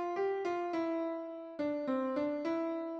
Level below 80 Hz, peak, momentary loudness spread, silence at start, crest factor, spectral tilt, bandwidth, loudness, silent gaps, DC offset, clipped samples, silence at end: -78 dBFS; -24 dBFS; 5 LU; 0 s; 12 dB; -6 dB/octave; 7.6 kHz; -36 LUFS; none; under 0.1%; under 0.1%; 0 s